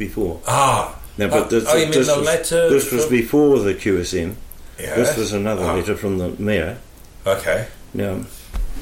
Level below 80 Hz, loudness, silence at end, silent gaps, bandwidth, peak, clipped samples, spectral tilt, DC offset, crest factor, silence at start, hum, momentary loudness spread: -36 dBFS; -19 LUFS; 0 s; none; 16.5 kHz; -4 dBFS; under 0.1%; -4.5 dB/octave; under 0.1%; 14 dB; 0 s; none; 14 LU